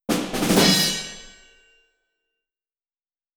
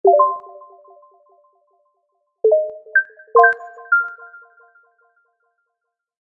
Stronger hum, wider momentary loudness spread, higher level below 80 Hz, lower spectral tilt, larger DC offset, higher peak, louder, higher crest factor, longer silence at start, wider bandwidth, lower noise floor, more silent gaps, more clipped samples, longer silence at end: neither; first, 19 LU vs 15 LU; first, -48 dBFS vs -80 dBFS; second, -3 dB/octave vs -5.5 dB/octave; neither; second, -4 dBFS vs 0 dBFS; about the same, -19 LUFS vs -17 LUFS; about the same, 22 dB vs 20 dB; about the same, 0.1 s vs 0.05 s; first, over 20 kHz vs 3.3 kHz; first, under -90 dBFS vs -79 dBFS; neither; neither; about the same, 2.05 s vs 1.95 s